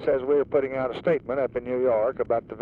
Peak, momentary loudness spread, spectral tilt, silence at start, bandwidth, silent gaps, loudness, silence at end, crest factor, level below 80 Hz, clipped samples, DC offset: -10 dBFS; 5 LU; -9 dB/octave; 0 s; 4.8 kHz; none; -25 LUFS; 0 s; 14 dB; -56 dBFS; under 0.1%; under 0.1%